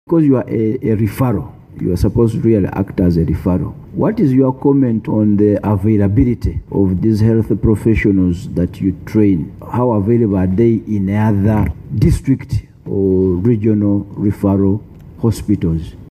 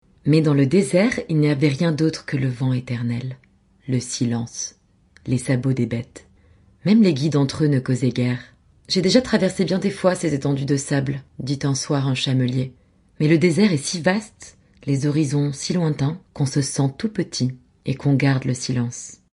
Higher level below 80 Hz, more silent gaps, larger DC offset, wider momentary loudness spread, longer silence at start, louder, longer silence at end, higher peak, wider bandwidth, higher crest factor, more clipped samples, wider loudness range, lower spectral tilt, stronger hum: first, -32 dBFS vs -54 dBFS; neither; neither; second, 7 LU vs 11 LU; second, 0.1 s vs 0.25 s; first, -15 LUFS vs -21 LUFS; about the same, 0.1 s vs 0.2 s; about the same, -2 dBFS vs -2 dBFS; first, 14.5 kHz vs 11.5 kHz; second, 12 dB vs 18 dB; neither; second, 2 LU vs 5 LU; first, -9.5 dB/octave vs -6 dB/octave; neither